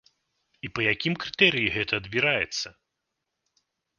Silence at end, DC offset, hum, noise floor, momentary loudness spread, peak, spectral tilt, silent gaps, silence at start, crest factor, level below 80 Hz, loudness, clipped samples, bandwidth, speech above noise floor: 1.3 s; under 0.1%; none; -82 dBFS; 14 LU; -4 dBFS; -4 dB/octave; none; 0.65 s; 26 dB; -58 dBFS; -24 LUFS; under 0.1%; 10 kHz; 56 dB